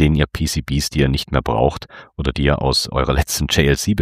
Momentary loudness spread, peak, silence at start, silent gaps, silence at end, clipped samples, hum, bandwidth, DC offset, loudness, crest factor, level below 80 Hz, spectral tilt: 7 LU; -2 dBFS; 0 s; none; 0 s; under 0.1%; none; 15.5 kHz; under 0.1%; -18 LUFS; 16 dB; -26 dBFS; -5 dB/octave